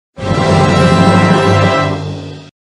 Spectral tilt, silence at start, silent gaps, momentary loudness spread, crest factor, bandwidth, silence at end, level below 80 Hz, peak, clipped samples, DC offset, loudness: -6.5 dB/octave; 0.15 s; none; 14 LU; 10 dB; 11.5 kHz; 0.15 s; -36 dBFS; 0 dBFS; 0.1%; under 0.1%; -10 LUFS